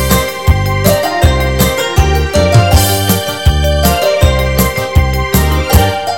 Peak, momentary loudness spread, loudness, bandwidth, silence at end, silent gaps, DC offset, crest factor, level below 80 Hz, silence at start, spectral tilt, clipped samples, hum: 0 dBFS; 3 LU; -11 LUFS; 17.5 kHz; 0 s; none; 1%; 10 dB; -16 dBFS; 0 s; -5 dB/octave; 0.7%; none